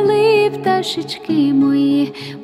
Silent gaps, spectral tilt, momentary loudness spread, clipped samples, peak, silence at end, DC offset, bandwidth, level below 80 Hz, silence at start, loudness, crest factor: none; -6 dB/octave; 9 LU; under 0.1%; -4 dBFS; 0 s; under 0.1%; 12.5 kHz; -62 dBFS; 0 s; -16 LUFS; 12 dB